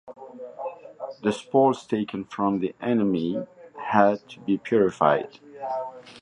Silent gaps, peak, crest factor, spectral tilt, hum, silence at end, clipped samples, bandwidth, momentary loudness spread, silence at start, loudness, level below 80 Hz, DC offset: none; -2 dBFS; 22 dB; -7 dB/octave; none; 0 s; under 0.1%; 10.5 kHz; 18 LU; 0.05 s; -24 LUFS; -64 dBFS; under 0.1%